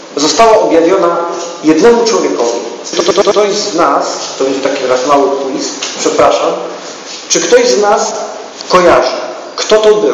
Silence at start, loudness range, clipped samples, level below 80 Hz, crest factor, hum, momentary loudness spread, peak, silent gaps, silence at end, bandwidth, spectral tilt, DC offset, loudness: 0 s; 2 LU; 1%; -46 dBFS; 10 dB; none; 12 LU; 0 dBFS; none; 0 s; 9.4 kHz; -2.5 dB/octave; under 0.1%; -10 LUFS